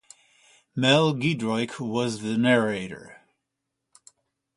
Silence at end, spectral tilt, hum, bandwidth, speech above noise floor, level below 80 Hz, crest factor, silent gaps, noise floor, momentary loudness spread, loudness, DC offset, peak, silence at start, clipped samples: 1.45 s; -5.5 dB/octave; none; 11.5 kHz; 59 dB; -64 dBFS; 22 dB; none; -82 dBFS; 15 LU; -24 LUFS; under 0.1%; -4 dBFS; 0.75 s; under 0.1%